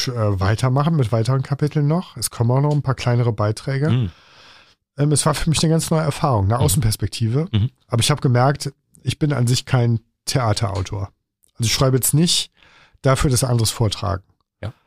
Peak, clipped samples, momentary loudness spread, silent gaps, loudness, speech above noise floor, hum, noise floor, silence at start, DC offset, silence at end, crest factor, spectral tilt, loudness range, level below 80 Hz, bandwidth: -4 dBFS; under 0.1%; 9 LU; none; -19 LUFS; 34 dB; none; -52 dBFS; 0 s; 0.3%; 0.15 s; 14 dB; -5 dB/octave; 2 LU; -40 dBFS; 15.5 kHz